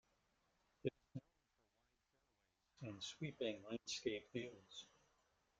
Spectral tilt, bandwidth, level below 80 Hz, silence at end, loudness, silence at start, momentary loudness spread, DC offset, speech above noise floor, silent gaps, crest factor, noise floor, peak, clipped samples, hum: -4.5 dB/octave; 9 kHz; -82 dBFS; 0.7 s; -49 LUFS; 0.85 s; 13 LU; under 0.1%; 36 dB; none; 24 dB; -85 dBFS; -28 dBFS; under 0.1%; none